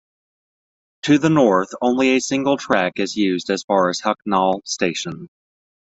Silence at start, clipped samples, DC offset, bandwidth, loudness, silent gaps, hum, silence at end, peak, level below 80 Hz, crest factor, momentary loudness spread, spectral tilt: 1.05 s; under 0.1%; under 0.1%; 8.2 kHz; -19 LUFS; 3.64-3.68 s; none; 0.7 s; 0 dBFS; -60 dBFS; 18 dB; 7 LU; -4.5 dB/octave